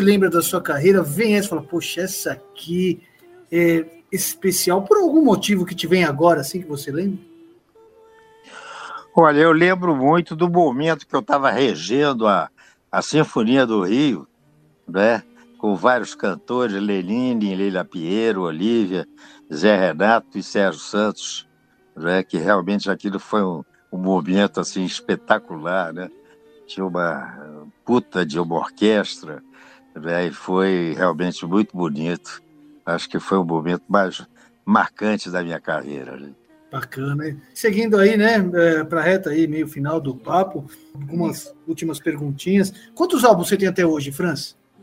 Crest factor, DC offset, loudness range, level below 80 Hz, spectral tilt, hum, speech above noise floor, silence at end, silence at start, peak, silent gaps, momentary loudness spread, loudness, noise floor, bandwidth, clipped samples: 20 dB; under 0.1%; 5 LU; -64 dBFS; -5 dB/octave; none; 37 dB; 0.3 s; 0 s; 0 dBFS; none; 14 LU; -20 LUFS; -57 dBFS; 16 kHz; under 0.1%